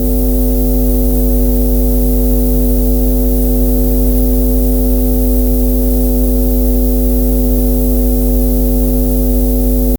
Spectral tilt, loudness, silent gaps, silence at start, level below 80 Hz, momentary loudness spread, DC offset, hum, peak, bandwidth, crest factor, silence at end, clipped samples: -7.5 dB/octave; -13 LUFS; none; 0 s; -12 dBFS; 0 LU; under 0.1%; none; 0 dBFS; over 20 kHz; 10 dB; 0 s; under 0.1%